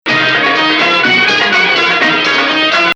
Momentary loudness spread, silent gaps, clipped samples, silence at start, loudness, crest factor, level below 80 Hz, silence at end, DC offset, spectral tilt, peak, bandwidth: 2 LU; none; under 0.1%; 0.05 s; -9 LUFS; 10 dB; -60 dBFS; 0 s; under 0.1%; -3 dB/octave; 0 dBFS; 10.5 kHz